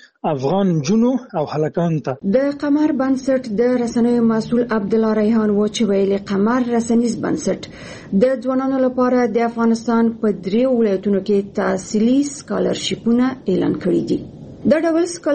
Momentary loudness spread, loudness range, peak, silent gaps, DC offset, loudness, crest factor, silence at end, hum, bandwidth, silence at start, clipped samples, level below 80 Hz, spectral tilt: 5 LU; 1 LU; -2 dBFS; none; under 0.1%; -18 LUFS; 16 dB; 0 s; none; 8.8 kHz; 0.25 s; under 0.1%; -52 dBFS; -6.5 dB/octave